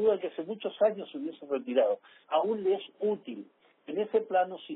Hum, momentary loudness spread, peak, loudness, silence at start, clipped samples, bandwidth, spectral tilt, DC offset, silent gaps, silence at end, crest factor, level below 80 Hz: none; 10 LU; -14 dBFS; -31 LUFS; 0 s; under 0.1%; 4 kHz; -3.5 dB/octave; under 0.1%; none; 0 s; 16 dB; -82 dBFS